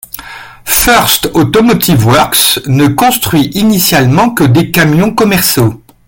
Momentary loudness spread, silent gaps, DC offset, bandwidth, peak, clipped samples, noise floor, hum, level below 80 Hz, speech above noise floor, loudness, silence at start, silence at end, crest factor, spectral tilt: 5 LU; none; under 0.1%; over 20 kHz; 0 dBFS; 0.2%; -29 dBFS; none; -32 dBFS; 21 dB; -8 LUFS; 0.15 s; 0.3 s; 8 dB; -4.5 dB/octave